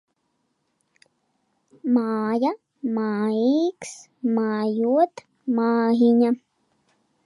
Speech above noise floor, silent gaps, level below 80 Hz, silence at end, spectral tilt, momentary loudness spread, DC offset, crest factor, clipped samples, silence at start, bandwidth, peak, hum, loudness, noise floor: 51 dB; none; -78 dBFS; 0.9 s; -6.5 dB/octave; 12 LU; under 0.1%; 16 dB; under 0.1%; 1.85 s; 11 kHz; -8 dBFS; none; -22 LUFS; -73 dBFS